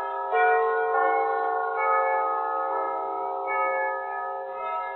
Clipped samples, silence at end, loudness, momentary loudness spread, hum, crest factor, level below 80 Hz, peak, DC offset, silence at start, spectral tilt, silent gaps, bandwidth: under 0.1%; 0 s; -25 LUFS; 9 LU; none; 14 dB; -84 dBFS; -10 dBFS; under 0.1%; 0 s; 0.5 dB/octave; none; 4.2 kHz